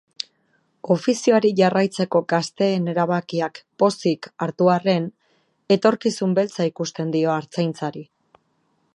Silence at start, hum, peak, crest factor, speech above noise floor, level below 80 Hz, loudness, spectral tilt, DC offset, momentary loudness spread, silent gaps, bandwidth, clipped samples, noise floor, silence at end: 0.85 s; none; -2 dBFS; 18 dB; 47 dB; -72 dBFS; -21 LUFS; -6 dB/octave; under 0.1%; 12 LU; none; 11.5 kHz; under 0.1%; -67 dBFS; 0.9 s